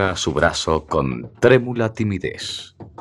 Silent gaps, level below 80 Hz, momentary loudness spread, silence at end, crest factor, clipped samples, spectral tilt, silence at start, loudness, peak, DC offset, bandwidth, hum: none; -42 dBFS; 13 LU; 0.1 s; 18 dB; under 0.1%; -5 dB/octave; 0 s; -20 LUFS; 0 dBFS; under 0.1%; 12 kHz; none